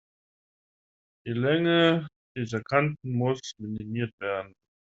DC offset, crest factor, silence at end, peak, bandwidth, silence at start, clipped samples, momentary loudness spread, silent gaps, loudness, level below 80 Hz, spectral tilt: under 0.1%; 22 dB; 0.4 s; -6 dBFS; 7.8 kHz; 1.25 s; under 0.1%; 14 LU; 2.16-2.35 s, 4.13-4.18 s; -27 LUFS; -66 dBFS; -4.5 dB/octave